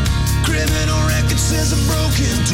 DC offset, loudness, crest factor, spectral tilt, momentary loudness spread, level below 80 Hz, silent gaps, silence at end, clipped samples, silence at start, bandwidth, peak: under 0.1%; -16 LUFS; 8 dB; -4 dB/octave; 1 LU; -22 dBFS; none; 0 s; under 0.1%; 0 s; 17 kHz; -6 dBFS